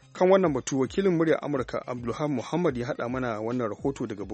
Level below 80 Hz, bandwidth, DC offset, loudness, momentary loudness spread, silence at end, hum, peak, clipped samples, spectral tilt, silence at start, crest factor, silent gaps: -54 dBFS; 8.4 kHz; under 0.1%; -27 LUFS; 9 LU; 0 s; none; -8 dBFS; under 0.1%; -6.5 dB/octave; 0.15 s; 20 dB; none